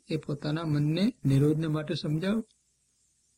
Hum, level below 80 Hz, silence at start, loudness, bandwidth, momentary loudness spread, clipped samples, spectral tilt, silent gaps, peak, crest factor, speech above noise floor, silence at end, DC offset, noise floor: none; -58 dBFS; 0.1 s; -29 LUFS; 13 kHz; 8 LU; under 0.1%; -7.5 dB/octave; none; -14 dBFS; 14 dB; 43 dB; 0.95 s; under 0.1%; -71 dBFS